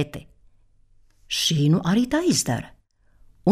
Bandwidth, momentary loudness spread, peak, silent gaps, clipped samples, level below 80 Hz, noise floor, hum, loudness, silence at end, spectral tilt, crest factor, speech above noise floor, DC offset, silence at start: 15.5 kHz; 12 LU; -6 dBFS; none; under 0.1%; -52 dBFS; -56 dBFS; none; -22 LUFS; 0 s; -4.5 dB/octave; 18 dB; 34 dB; under 0.1%; 0 s